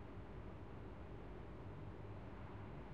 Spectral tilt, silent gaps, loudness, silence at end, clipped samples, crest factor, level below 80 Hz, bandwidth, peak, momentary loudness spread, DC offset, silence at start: -8.5 dB/octave; none; -54 LUFS; 0 s; under 0.1%; 12 dB; -60 dBFS; 8.4 kHz; -40 dBFS; 1 LU; 0.1%; 0 s